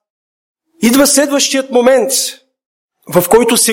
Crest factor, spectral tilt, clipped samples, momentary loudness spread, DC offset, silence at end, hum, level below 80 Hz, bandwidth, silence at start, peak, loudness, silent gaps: 12 dB; -2.5 dB/octave; under 0.1%; 7 LU; under 0.1%; 0 s; none; -48 dBFS; 17.5 kHz; 0.8 s; 0 dBFS; -11 LUFS; 2.66-2.88 s